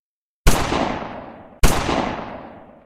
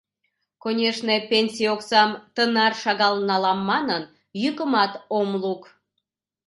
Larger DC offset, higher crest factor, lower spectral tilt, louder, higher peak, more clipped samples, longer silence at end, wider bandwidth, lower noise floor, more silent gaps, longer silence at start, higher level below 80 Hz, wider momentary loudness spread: neither; about the same, 20 dB vs 20 dB; about the same, -4.5 dB/octave vs -4.5 dB/octave; about the same, -22 LUFS vs -22 LUFS; about the same, -2 dBFS vs -2 dBFS; neither; second, 0.2 s vs 0.85 s; first, 16 kHz vs 11.5 kHz; second, -39 dBFS vs -80 dBFS; neither; second, 0.45 s vs 0.65 s; first, -26 dBFS vs -72 dBFS; first, 17 LU vs 8 LU